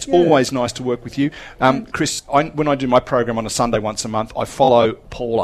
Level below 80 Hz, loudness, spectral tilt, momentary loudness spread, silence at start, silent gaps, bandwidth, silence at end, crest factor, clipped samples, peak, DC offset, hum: -42 dBFS; -18 LUFS; -5 dB/octave; 9 LU; 0 s; none; 14 kHz; 0 s; 16 dB; under 0.1%; 0 dBFS; under 0.1%; none